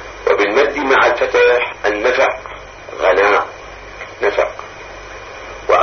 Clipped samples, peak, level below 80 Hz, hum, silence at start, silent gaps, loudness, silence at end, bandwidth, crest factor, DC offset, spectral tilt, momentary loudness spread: under 0.1%; 0 dBFS; -42 dBFS; none; 0 s; none; -14 LUFS; 0 s; 6.6 kHz; 16 dB; under 0.1%; -3.5 dB/octave; 19 LU